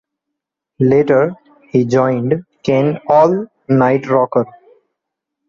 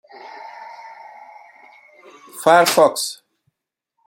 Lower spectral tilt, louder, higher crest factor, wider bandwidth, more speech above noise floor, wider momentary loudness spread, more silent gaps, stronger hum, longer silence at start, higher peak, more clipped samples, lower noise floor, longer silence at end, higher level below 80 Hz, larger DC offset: first, -8.5 dB/octave vs -2.5 dB/octave; about the same, -15 LUFS vs -15 LUFS; second, 14 dB vs 20 dB; second, 7.2 kHz vs 16.5 kHz; about the same, 66 dB vs 64 dB; second, 8 LU vs 26 LU; neither; neither; first, 0.8 s vs 0.25 s; about the same, -2 dBFS vs -2 dBFS; neither; about the same, -79 dBFS vs -80 dBFS; about the same, 1 s vs 0.9 s; first, -56 dBFS vs -72 dBFS; neither